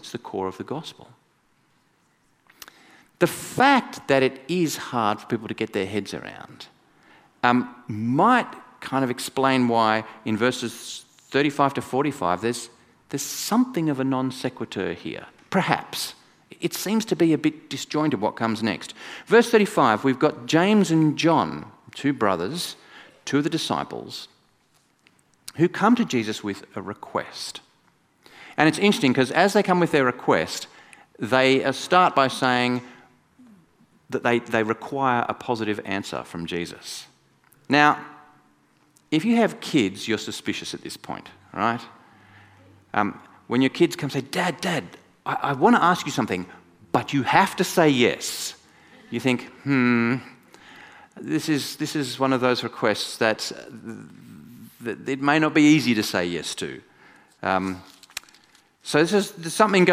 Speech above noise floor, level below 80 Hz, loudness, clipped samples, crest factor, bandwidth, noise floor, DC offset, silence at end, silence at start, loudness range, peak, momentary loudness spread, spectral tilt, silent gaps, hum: 42 dB; -66 dBFS; -23 LUFS; under 0.1%; 24 dB; 15.5 kHz; -64 dBFS; under 0.1%; 0 s; 0.05 s; 6 LU; 0 dBFS; 17 LU; -5 dB/octave; none; none